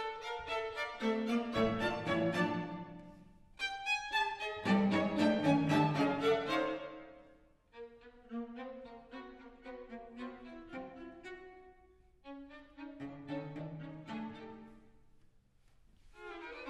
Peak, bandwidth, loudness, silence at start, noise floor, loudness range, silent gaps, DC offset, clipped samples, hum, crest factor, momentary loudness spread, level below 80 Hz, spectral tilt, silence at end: -18 dBFS; 12.5 kHz; -35 LUFS; 0 s; -66 dBFS; 18 LU; none; under 0.1%; under 0.1%; none; 20 dB; 22 LU; -64 dBFS; -6 dB/octave; 0 s